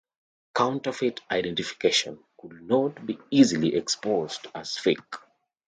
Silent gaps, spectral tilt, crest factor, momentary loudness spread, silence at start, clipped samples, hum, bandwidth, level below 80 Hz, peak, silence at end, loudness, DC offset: none; -4 dB/octave; 22 dB; 15 LU; 0.55 s; under 0.1%; none; 9.4 kHz; -66 dBFS; -6 dBFS; 0.5 s; -26 LUFS; under 0.1%